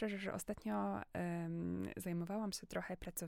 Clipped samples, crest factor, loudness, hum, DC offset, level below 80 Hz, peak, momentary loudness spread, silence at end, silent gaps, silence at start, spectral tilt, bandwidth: under 0.1%; 14 dB; -43 LUFS; none; under 0.1%; -64 dBFS; -28 dBFS; 4 LU; 0 s; none; 0 s; -5.5 dB/octave; 16.5 kHz